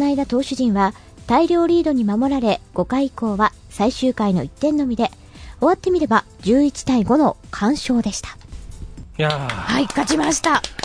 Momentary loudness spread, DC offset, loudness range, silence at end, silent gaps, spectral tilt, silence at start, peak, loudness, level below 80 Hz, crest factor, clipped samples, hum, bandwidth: 7 LU; under 0.1%; 2 LU; 0 s; none; -5 dB/octave; 0 s; -2 dBFS; -19 LUFS; -42 dBFS; 18 dB; under 0.1%; none; 11 kHz